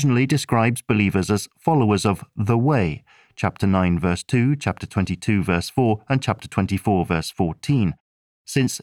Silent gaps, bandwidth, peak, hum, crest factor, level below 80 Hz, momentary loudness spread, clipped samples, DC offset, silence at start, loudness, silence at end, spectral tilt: 8.00-8.45 s; 16 kHz; -4 dBFS; none; 16 dB; -46 dBFS; 6 LU; under 0.1%; 0.1%; 0 s; -21 LUFS; 0.05 s; -6.5 dB/octave